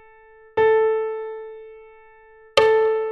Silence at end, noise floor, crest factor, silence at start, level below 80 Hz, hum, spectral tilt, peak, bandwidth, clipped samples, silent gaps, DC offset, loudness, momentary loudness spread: 0 s; -49 dBFS; 22 dB; 0.55 s; -58 dBFS; none; -3 dB/octave; 0 dBFS; 8.6 kHz; under 0.1%; none; under 0.1%; -20 LUFS; 19 LU